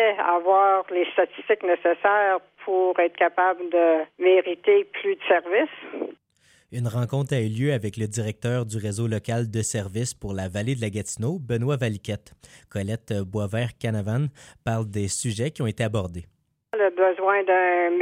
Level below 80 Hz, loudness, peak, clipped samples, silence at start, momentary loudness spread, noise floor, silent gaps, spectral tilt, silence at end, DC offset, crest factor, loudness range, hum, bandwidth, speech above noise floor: -58 dBFS; -24 LUFS; -6 dBFS; under 0.1%; 0 s; 10 LU; -61 dBFS; none; -5.5 dB/octave; 0 s; under 0.1%; 18 dB; 7 LU; none; 15.5 kHz; 38 dB